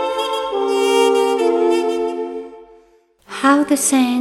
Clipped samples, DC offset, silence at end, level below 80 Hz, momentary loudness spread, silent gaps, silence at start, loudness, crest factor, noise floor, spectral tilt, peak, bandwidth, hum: under 0.1%; under 0.1%; 0 s; -60 dBFS; 13 LU; none; 0 s; -16 LUFS; 16 dB; -53 dBFS; -2 dB/octave; -2 dBFS; 16 kHz; none